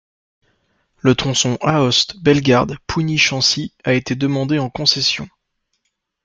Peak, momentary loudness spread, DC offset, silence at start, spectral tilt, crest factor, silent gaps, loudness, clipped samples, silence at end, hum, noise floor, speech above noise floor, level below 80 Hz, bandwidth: 0 dBFS; 7 LU; under 0.1%; 1.05 s; -4 dB/octave; 18 dB; none; -16 LUFS; under 0.1%; 1 s; none; -72 dBFS; 55 dB; -46 dBFS; 9.4 kHz